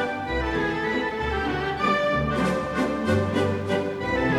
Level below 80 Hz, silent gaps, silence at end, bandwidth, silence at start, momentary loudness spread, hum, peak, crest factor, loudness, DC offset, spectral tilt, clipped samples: -40 dBFS; none; 0 s; 16 kHz; 0 s; 4 LU; none; -10 dBFS; 14 dB; -25 LUFS; under 0.1%; -6.5 dB/octave; under 0.1%